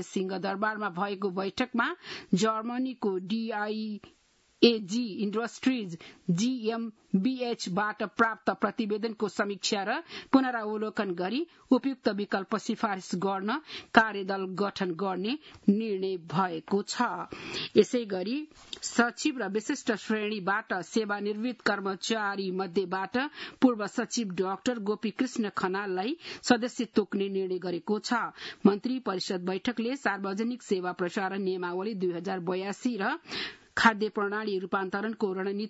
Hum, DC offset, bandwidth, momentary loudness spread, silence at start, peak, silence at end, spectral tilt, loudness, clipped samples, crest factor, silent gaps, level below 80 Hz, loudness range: none; under 0.1%; 8 kHz; 7 LU; 0 s; -4 dBFS; 0 s; -5 dB/octave; -30 LUFS; under 0.1%; 26 dB; none; -72 dBFS; 2 LU